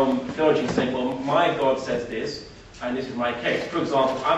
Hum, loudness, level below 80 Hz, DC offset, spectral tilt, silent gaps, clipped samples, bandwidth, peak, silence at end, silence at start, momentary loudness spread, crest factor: none; -24 LUFS; -52 dBFS; under 0.1%; -5.5 dB/octave; none; under 0.1%; 8.4 kHz; -6 dBFS; 0 s; 0 s; 9 LU; 16 dB